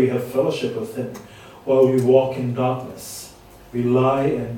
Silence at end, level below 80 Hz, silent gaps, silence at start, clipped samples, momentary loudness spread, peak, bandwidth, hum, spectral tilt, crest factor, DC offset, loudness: 0 s; -54 dBFS; none; 0 s; under 0.1%; 17 LU; -2 dBFS; 18 kHz; none; -7 dB/octave; 18 dB; under 0.1%; -20 LUFS